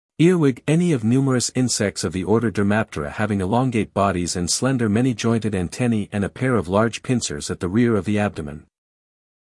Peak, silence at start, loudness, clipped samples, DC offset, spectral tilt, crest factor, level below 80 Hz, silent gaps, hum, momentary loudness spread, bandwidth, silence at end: -4 dBFS; 0.2 s; -21 LUFS; under 0.1%; under 0.1%; -5.5 dB/octave; 16 dB; -50 dBFS; none; none; 6 LU; 12 kHz; 0.9 s